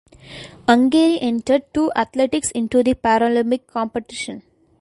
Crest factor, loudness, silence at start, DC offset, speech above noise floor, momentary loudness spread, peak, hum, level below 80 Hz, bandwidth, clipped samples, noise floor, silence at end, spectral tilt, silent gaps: 18 dB; -18 LUFS; 0.3 s; under 0.1%; 21 dB; 15 LU; 0 dBFS; none; -50 dBFS; 11.5 kHz; under 0.1%; -39 dBFS; 0.4 s; -4 dB/octave; none